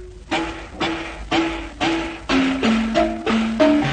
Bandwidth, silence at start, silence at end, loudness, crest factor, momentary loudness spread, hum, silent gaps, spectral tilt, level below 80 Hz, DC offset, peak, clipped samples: 9.6 kHz; 0 s; 0 s; -21 LUFS; 16 dB; 8 LU; none; none; -5 dB/octave; -38 dBFS; under 0.1%; -4 dBFS; under 0.1%